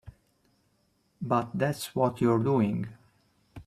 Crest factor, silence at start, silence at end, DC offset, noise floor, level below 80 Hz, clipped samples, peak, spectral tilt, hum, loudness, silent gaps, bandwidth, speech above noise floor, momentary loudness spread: 20 dB; 0.05 s; 0.05 s; under 0.1%; -71 dBFS; -62 dBFS; under 0.1%; -10 dBFS; -7 dB/octave; none; -28 LUFS; none; 15.5 kHz; 44 dB; 11 LU